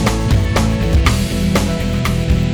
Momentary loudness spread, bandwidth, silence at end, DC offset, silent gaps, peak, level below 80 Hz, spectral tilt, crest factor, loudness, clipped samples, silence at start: 3 LU; over 20 kHz; 0 s; under 0.1%; none; 0 dBFS; -20 dBFS; -5.5 dB/octave; 14 dB; -16 LUFS; under 0.1%; 0 s